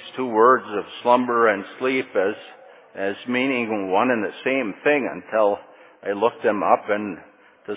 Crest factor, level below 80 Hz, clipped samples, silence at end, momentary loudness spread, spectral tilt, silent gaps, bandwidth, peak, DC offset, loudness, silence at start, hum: 20 dB; -70 dBFS; under 0.1%; 0 s; 12 LU; -9 dB/octave; none; 4 kHz; -2 dBFS; under 0.1%; -21 LUFS; 0 s; none